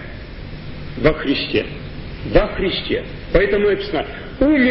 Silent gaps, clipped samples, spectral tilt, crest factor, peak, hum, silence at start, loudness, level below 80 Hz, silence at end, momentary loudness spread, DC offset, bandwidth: none; under 0.1%; -9.5 dB/octave; 18 dB; 0 dBFS; none; 0 s; -19 LUFS; -30 dBFS; 0 s; 16 LU; under 0.1%; 5.8 kHz